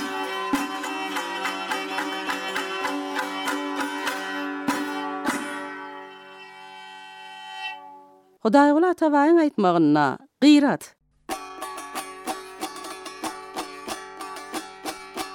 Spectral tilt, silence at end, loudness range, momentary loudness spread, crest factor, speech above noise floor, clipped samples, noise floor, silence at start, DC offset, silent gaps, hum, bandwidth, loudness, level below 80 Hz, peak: -4.5 dB/octave; 0 s; 14 LU; 21 LU; 20 dB; 33 dB; under 0.1%; -51 dBFS; 0 s; under 0.1%; none; none; 17.5 kHz; -24 LUFS; -68 dBFS; -4 dBFS